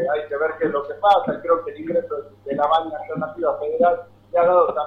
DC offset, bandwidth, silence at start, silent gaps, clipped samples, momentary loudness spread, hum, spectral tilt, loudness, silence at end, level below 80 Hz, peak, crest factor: under 0.1%; 5.6 kHz; 0 s; none; under 0.1%; 11 LU; none; -7 dB/octave; -21 LUFS; 0 s; -60 dBFS; -4 dBFS; 16 dB